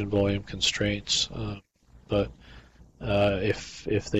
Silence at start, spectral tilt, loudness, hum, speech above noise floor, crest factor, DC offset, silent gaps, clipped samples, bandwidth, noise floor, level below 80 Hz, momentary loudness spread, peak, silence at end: 0 s; -4.5 dB/octave; -27 LUFS; none; 24 dB; 16 dB; under 0.1%; none; under 0.1%; 10.5 kHz; -51 dBFS; -46 dBFS; 11 LU; -14 dBFS; 0 s